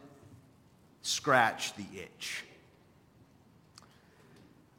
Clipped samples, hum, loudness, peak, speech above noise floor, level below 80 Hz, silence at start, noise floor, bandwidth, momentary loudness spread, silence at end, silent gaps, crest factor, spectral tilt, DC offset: under 0.1%; none; -32 LUFS; -10 dBFS; 31 dB; -74 dBFS; 0.05 s; -63 dBFS; 16.5 kHz; 20 LU; 2.3 s; none; 26 dB; -2.5 dB/octave; under 0.1%